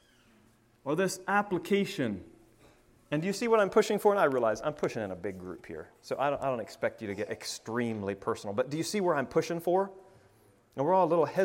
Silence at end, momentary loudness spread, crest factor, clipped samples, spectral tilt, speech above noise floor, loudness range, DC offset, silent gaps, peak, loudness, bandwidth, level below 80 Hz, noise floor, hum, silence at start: 0 s; 14 LU; 20 dB; under 0.1%; -5 dB/octave; 34 dB; 5 LU; under 0.1%; none; -12 dBFS; -30 LUFS; 16 kHz; -68 dBFS; -64 dBFS; none; 0.85 s